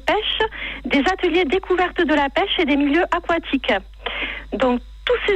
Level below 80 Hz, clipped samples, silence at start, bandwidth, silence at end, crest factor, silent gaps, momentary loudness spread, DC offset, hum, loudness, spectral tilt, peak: -40 dBFS; under 0.1%; 0.05 s; 9 kHz; 0 s; 12 dB; none; 7 LU; under 0.1%; none; -20 LUFS; -4.5 dB/octave; -6 dBFS